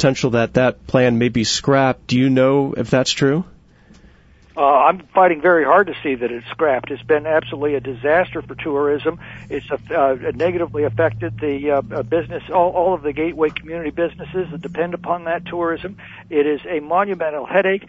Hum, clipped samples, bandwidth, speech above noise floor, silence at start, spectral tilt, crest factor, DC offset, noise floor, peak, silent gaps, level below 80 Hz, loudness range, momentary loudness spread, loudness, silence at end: none; under 0.1%; 8 kHz; 31 dB; 0 s; -5.5 dB/octave; 18 dB; under 0.1%; -49 dBFS; -2 dBFS; none; -48 dBFS; 5 LU; 11 LU; -18 LUFS; 0.05 s